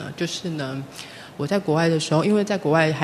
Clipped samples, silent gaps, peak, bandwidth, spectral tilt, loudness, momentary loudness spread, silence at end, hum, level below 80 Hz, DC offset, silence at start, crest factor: under 0.1%; none; -2 dBFS; 13.5 kHz; -5.5 dB/octave; -22 LUFS; 15 LU; 0 s; none; -62 dBFS; under 0.1%; 0 s; 20 dB